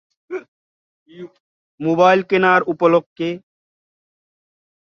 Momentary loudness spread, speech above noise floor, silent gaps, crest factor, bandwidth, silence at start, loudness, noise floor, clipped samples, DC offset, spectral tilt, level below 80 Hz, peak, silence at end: 22 LU; over 74 dB; 0.48-1.06 s, 1.40-1.78 s, 3.06-3.16 s; 18 dB; 6.8 kHz; 0.3 s; -16 LUFS; under -90 dBFS; under 0.1%; under 0.1%; -6.5 dB/octave; -66 dBFS; -2 dBFS; 1.45 s